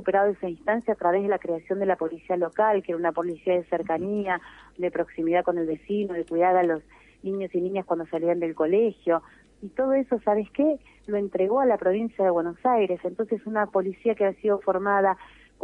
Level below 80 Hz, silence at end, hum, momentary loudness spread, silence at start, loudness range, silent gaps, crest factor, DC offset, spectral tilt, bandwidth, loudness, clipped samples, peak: -62 dBFS; 0.35 s; none; 7 LU; 0 s; 2 LU; none; 16 dB; under 0.1%; -8.5 dB/octave; 4.1 kHz; -25 LUFS; under 0.1%; -10 dBFS